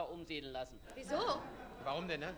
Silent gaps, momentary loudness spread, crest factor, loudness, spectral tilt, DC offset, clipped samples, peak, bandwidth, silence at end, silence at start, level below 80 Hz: none; 12 LU; 20 dB; -42 LUFS; -4.5 dB/octave; under 0.1%; under 0.1%; -22 dBFS; 19.5 kHz; 0 s; 0 s; -62 dBFS